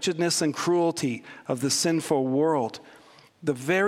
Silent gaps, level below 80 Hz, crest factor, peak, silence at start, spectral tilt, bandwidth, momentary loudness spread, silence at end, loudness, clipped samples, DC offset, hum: none; -72 dBFS; 16 dB; -10 dBFS; 0 s; -4 dB/octave; 16 kHz; 9 LU; 0 s; -26 LUFS; under 0.1%; under 0.1%; none